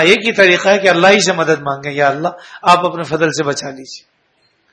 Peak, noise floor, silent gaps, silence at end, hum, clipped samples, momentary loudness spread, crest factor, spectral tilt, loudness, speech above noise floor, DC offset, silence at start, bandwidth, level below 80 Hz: 0 dBFS; -59 dBFS; none; 0.75 s; none; 0.2%; 13 LU; 14 dB; -3.5 dB/octave; -13 LUFS; 46 dB; under 0.1%; 0 s; 11 kHz; -56 dBFS